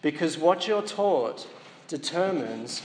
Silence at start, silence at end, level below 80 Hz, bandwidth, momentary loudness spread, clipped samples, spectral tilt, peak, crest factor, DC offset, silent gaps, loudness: 0 s; 0 s; -84 dBFS; 10.5 kHz; 16 LU; under 0.1%; -4 dB/octave; -8 dBFS; 18 dB; under 0.1%; none; -26 LUFS